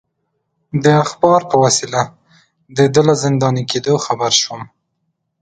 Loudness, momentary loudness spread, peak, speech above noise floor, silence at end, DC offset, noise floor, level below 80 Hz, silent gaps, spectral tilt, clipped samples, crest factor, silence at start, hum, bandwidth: -15 LUFS; 11 LU; 0 dBFS; 56 dB; 0.75 s; under 0.1%; -70 dBFS; -54 dBFS; none; -4.5 dB/octave; under 0.1%; 16 dB; 0.75 s; none; 9.4 kHz